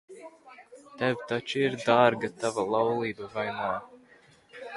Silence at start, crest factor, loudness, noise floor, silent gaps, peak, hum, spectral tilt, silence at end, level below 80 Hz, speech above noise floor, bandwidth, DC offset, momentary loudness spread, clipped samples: 0.1 s; 22 dB; -28 LUFS; -58 dBFS; none; -6 dBFS; none; -5 dB/octave; 0 s; -68 dBFS; 31 dB; 11.5 kHz; under 0.1%; 20 LU; under 0.1%